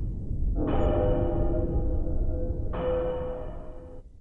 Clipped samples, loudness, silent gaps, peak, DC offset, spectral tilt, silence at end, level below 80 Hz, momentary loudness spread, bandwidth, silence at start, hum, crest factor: under 0.1%; -30 LUFS; none; -14 dBFS; under 0.1%; -10.5 dB/octave; 0 s; -30 dBFS; 16 LU; 3.6 kHz; 0 s; none; 14 dB